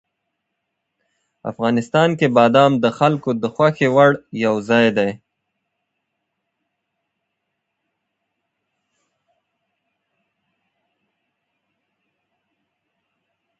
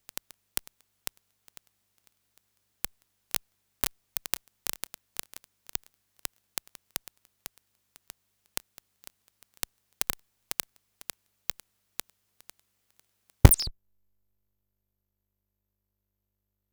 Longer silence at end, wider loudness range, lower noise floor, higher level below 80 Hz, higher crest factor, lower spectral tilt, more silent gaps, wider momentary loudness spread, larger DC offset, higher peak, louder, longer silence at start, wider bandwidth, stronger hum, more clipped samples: first, 8.45 s vs 3 s; second, 8 LU vs 13 LU; second, -77 dBFS vs -83 dBFS; second, -64 dBFS vs -40 dBFS; second, 22 dB vs 34 dB; first, -6.5 dB/octave vs -4 dB/octave; neither; second, 9 LU vs 18 LU; neither; about the same, 0 dBFS vs 0 dBFS; first, -16 LUFS vs -32 LUFS; second, 1.45 s vs 13.45 s; second, 8.2 kHz vs over 20 kHz; second, none vs 50 Hz at -60 dBFS; neither